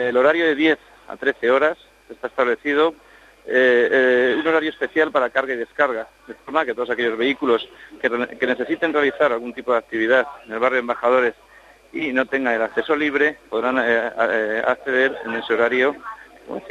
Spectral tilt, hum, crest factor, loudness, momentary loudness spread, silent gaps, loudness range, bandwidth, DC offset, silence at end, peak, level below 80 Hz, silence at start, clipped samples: -5 dB/octave; none; 18 dB; -20 LUFS; 10 LU; none; 3 LU; 9.8 kHz; under 0.1%; 0 s; -4 dBFS; -60 dBFS; 0 s; under 0.1%